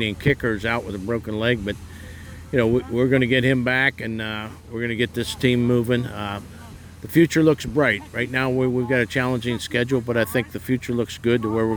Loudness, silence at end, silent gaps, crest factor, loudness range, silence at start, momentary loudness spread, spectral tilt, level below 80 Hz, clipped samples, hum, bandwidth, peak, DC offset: -22 LUFS; 0 s; none; 18 dB; 2 LU; 0 s; 13 LU; -6 dB/octave; -48 dBFS; under 0.1%; none; over 20 kHz; -4 dBFS; under 0.1%